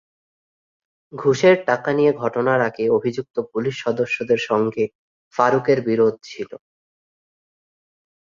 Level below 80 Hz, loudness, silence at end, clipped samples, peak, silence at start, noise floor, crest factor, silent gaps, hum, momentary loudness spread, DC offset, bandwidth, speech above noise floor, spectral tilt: -64 dBFS; -20 LUFS; 1.75 s; under 0.1%; -2 dBFS; 1.15 s; under -90 dBFS; 20 dB; 4.95-5.31 s; none; 13 LU; under 0.1%; 7.4 kHz; over 71 dB; -6 dB/octave